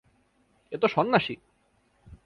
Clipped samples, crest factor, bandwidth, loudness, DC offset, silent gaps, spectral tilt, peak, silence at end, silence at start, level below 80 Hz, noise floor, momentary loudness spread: under 0.1%; 24 dB; 6.2 kHz; -26 LUFS; under 0.1%; none; -7 dB/octave; -6 dBFS; 0.1 s; 0.7 s; -62 dBFS; -68 dBFS; 17 LU